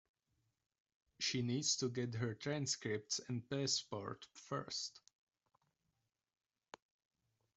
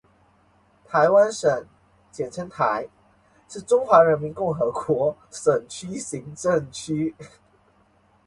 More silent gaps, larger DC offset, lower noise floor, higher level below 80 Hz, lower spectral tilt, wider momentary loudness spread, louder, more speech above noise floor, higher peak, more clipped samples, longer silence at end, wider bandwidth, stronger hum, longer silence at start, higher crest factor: neither; neither; first, -87 dBFS vs -60 dBFS; second, -80 dBFS vs -60 dBFS; second, -3.5 dB/octave vs -5 dB/octave; second, 10 LU vs 15 LU; second, -41 LUFS vs -23 LUFS; first, 46 dB vs 38 dB; second, -24 dBFS vs -2 dBFS; neither; first, 2.6 s vs 1 s; second, 8.2 kHz vs 11.5 kHz; neither; first, 1.2 s vs 0.9 s; about the same, 22 dB vs 22 dB